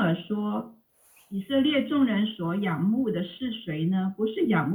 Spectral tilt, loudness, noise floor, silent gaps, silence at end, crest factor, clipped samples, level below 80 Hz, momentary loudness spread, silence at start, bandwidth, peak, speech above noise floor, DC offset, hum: -8 dB/octave; -27 LUFS; -60 dBFS; none; 0 s; 14 dB; under 0.1%; -68 dBFS; 10 LU; 0 s; 20 kHz; -12 dBFS; 34 dB; under 0.1%; none